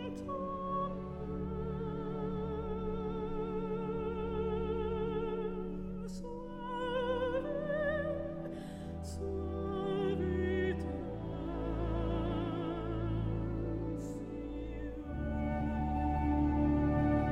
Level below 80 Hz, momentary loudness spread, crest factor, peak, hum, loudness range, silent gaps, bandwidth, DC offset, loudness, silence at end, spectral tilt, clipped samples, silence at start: -44 dBFS; 10 LU; 16 dB; -20 dBFS; none; 2 LU; none; 11 kHz; under 0.1%; -37 LUFS; 0 s; -8.5 dB/octave; under 0.1%; 0 s